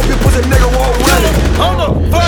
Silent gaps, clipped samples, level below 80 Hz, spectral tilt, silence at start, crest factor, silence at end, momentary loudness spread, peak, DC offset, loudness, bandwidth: none; under 0.1%; -14 dBFS; -5 dB/octave; 0 s; 10 dB; 0 s; 2 LU; 0 dBFS; under 0.1%; -11 LUFS; over 20 kHz